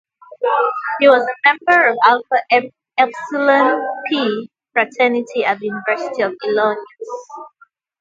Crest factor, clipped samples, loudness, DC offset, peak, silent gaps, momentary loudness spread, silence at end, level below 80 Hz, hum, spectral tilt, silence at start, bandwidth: 16 dB; under 0.1%; -16 LUFS; under 0.1%; 0 dBFS; none; 14 LU; 0.5 s; -70 dBFS; none; -4.5 dB/octave; 0.4 s; 7.6 kHz